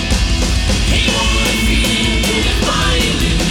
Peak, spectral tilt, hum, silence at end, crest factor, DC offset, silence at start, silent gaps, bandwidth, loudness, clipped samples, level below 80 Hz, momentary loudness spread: -2 dBFS; -3.5 dB/octave; none; 0 s; 12 dB; under 0.1%; 0 s; none; 17 kHz; -14 LUFS; under 0.1%; -18 dBFS; 2 LU